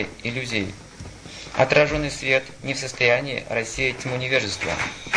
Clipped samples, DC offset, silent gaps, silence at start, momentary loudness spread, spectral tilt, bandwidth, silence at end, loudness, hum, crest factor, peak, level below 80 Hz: under 0.1%; under 0.1%; none; 0 s; 16 LU; -4 dB/octave; 10.5 kHz; 0 s; -23 LUFS; none; 20 dB; -4 dBFS; -46 dBFS